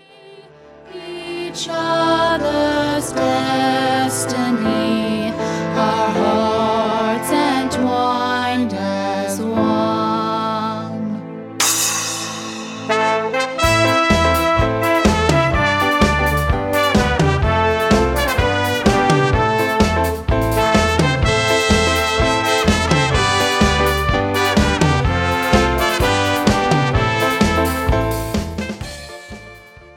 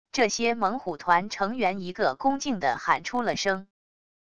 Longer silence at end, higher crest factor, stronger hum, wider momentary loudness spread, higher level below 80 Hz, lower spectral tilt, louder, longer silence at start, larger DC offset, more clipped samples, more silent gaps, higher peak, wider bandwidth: second, 0.05 s vs 0.7 s; about the same, 16 dB vs 20 dB; neither; first, 9 LU vs 4 LU; first, -28 dBFS vs -60 dBFS; about the same, -4.5 dB/octave vs -3.5 dB/octave; first, -17 LUFS vs -26 LUFS; first, 0.25 s vs 0.05 s; second, under 0.1% vs 0.5%; neither; neither; first, 0 dBFS vs -6 dBFS; first, 18 kHz vs 11 kHz